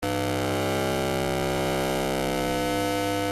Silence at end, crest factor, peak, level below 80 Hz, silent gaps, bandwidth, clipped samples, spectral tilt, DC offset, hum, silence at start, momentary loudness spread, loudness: 0 s; 14 dB; -12 dBFS; -44 dBFS; none; 16 kHz; under 0.1%; -4.5 dB/octave; under 0.1%; none; 0 s; 1 LU; -26 LUFS